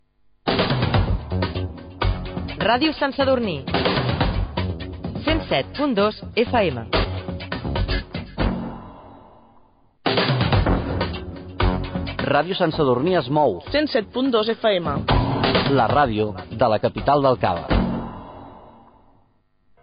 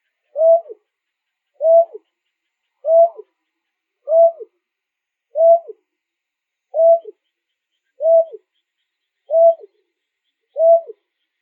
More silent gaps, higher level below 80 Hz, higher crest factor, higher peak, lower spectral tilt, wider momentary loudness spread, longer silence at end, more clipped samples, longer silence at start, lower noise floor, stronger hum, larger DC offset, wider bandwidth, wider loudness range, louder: neither; first, -32 dBFS vs under -90 dBFS; about the same, 16 dB vs 14 dB; about the same, -6 dBFS vs -4 dBFS; second, -4.5 dB/octave vs -6 dB/octave; second, 11 LU vs 14 LU; first, 1.15 s vs 0.6 s; neither; about the same, 0.45 s vs 0.35 s; second, -60 dBFS vs -81 dBFS; neither; neither; first, 5.2 kHz vs 1.3 kHz; first, 5 LU vs 2 LU; second, -22 LUFS vs -15 LUFS